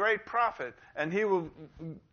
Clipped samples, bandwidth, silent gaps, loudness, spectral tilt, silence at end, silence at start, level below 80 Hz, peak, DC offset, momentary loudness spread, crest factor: under 0.1%; 6.8 kHz; none; -31 LUFS; -3.5 dB/octave; 0.15 s; 0 s; -66 dBFS; -16 dBFS; under 0.1%; 16 LU; 16 dB